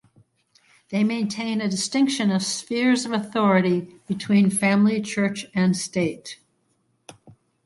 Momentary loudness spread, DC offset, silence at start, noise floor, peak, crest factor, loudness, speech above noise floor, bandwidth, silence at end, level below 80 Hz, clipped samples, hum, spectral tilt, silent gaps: 9 LU; under 0.1%; 0.9 s; -68 dBFS; -6 dBFS; 16 dB; -22 LUFS; 47 dB; 12 kHz; 0.35 s; -66 dBFS; under 0.1%; none; -5 dB/octave; none